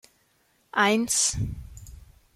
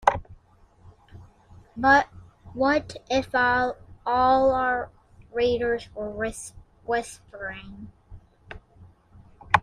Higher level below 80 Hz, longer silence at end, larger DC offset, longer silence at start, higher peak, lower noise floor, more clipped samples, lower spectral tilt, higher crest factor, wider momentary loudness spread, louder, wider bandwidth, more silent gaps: about the same, -46 dBFS vs -50 dBFS; first, 0.3 s vs 0 s; neither; first, 0.75 s vs 0.05 s; second, -8 dBFS vs -2 dBFS; first, -67 dBFS vs -56 dBFS; neither; second, -2.5 dB/octave vs -4.5 dB/octave; second, 20 dB vs 26 dB; second, 19 LU vs 24 LU; about the same, -24 LUFS vs -25 LUFS; first, 15.5 kHz vs 14 kHz; neither